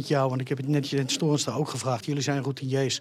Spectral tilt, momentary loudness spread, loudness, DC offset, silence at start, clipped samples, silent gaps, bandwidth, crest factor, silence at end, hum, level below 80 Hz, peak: -5 dB/octave; 4 LU; -27 LUFS; under 0.1%; 0 s; under 0.1%; none; 14.5 kHz; 14 dB; 0 s; none; -82 dBFS; -12 dBFS